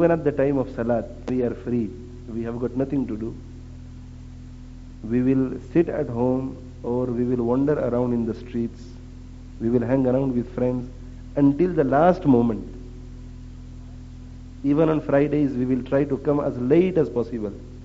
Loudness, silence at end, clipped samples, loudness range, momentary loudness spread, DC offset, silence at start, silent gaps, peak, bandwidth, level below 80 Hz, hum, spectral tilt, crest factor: -23 LUFS; 0 s; under 0.1%; 6 LU; 22 LU; under 0.1%; 0 s; none; -4 dBFS; 7.6 kHz; -42 dBFS; none; -8.5 dB/octave; 20 dB